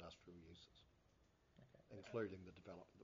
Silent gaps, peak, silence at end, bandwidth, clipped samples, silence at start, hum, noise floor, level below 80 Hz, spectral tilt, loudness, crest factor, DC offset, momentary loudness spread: none; -34 dBFS; 0 s; 7.2 kHz; under 0.1%; 0 s; none; -77 dBFS; -78 dBFS; -5 dB/octave; -55 LUFS; 24 dB; under 0.1%; 16 LU